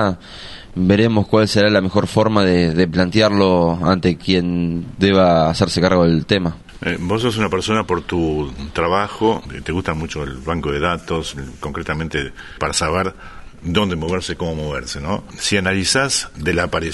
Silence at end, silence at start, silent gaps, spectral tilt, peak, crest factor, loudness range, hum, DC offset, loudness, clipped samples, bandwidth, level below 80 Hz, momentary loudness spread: 0 s; 0 s; none; -5 dB/octave; 0 dBFS; 18 dB; 7 LU; none; under 0.1%; -18 LUFS; under 0.1%; 11.5 kHz; -38 dBFS; 11 LU